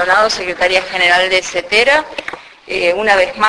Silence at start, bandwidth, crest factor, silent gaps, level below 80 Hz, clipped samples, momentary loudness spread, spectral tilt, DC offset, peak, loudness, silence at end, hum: 0 s; 11 kHz; 14 dB; none; -46 dBFS; under 0.1%; 14 LU; -1.5 dB/octave; under 0.1%; 0 dBFS; -12 LUFS; 0 s; none